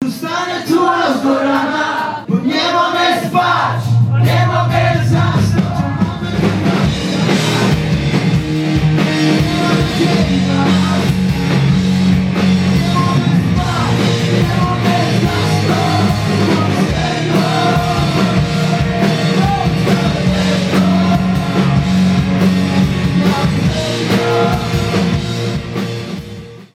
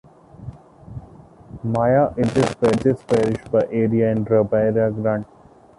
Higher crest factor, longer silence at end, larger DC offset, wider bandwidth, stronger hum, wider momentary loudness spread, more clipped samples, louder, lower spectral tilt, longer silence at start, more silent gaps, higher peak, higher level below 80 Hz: second, 10 dB vs 16 dB; second, 0.1 s vs 0.55 s; neither; first, 15 kHz vs 11.5 kHz; neither; second, 4 LU vs 21 LU; neither; first, -14 LUFS vs -19 LUFS; second, -6 dB/octave vs -7.5 dB/octave; second, 0 s vs 0.4 s; neither; about the same, -2 dBFS vs -4 dBFS; first, -32 dBFS vs -48 dBFS